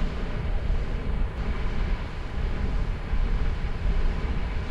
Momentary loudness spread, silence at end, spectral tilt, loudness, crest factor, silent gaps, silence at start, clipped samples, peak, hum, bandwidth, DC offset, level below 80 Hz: 3 LU; 0 s; -7.5 dB/octave; -31 LUFS; 12 dB; none; 0 s; under 0.1%; -14 dBFS; none; 6.8 kHz; under 0.1%; -26 dBFS